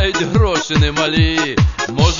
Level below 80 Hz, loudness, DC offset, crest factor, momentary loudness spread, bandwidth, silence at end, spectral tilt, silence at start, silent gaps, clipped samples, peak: -22 dBFS; -15 LUFS; 0.4%; 14 dB; 2 LU; 7.4 kHz; 0 s; -5 dB/octave; 0 s; none; under 0.1%; 0 dBFS